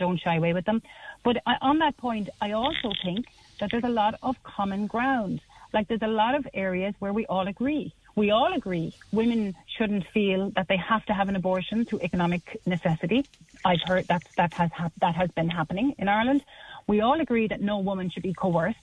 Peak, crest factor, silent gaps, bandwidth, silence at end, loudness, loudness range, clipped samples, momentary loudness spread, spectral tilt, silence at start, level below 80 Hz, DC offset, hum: -10 dBFS; 16 dB; none; 10 kHz; 0.1 s; -27 LUFS; 2 LU; under 0.1%; 7 LU; -7.5 dB/octave; 0 s; -54 dBFS; under 0.1%; none